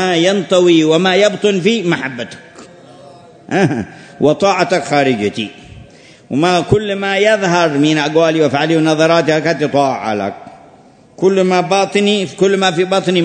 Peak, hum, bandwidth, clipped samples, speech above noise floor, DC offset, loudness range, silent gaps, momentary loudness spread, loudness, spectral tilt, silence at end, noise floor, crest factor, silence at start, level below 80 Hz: 0 dBFS; none; 9.6 kHz; under 0.1%; 31 dB; under 0.1%; 4 LU; none; 9 LU; -13 LUFS; -5 dB/octave; 0 s; -44 dBFS; 14 dB; 0 s; -48 dBFS